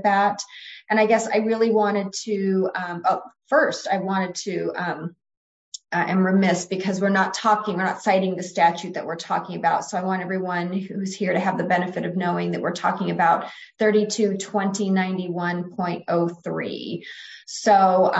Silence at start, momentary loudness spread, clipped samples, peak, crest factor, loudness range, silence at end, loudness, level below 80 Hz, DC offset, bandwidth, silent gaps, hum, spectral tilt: 0 s; 10 LU; under 0.1%; -6 dBFS; 16 dB; 3 LU; 0 s; -23 LUFS; -70 dBFS; under 0.1%; 8.2 kHz; 5.37-5.72 s; none; -5 dB/octave